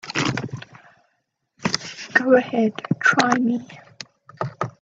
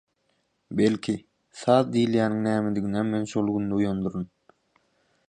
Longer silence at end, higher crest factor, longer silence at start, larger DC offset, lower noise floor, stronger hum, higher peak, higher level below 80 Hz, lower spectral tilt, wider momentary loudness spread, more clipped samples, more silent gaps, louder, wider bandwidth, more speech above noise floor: second, 0.1 s vs 1.05 s; about the same, 22 dB vs 20 dB; second, 0.05 s vs 0.7 s; neither; about the same, -72 dBFS vs -72 dBFS; neither; first, 0 dBFS vs -6 dBFS; about the same, -62 dBFS vs -58 dBFS; second, -4.5 dB/octave vs -7 dB/octave; first, 21 LU vs 10 LU; neither; neither; first, -21 LUFS vs -25 LUFS; second, 8 kHz vs 9.8 kHz; first, 53 dB vs 48 dB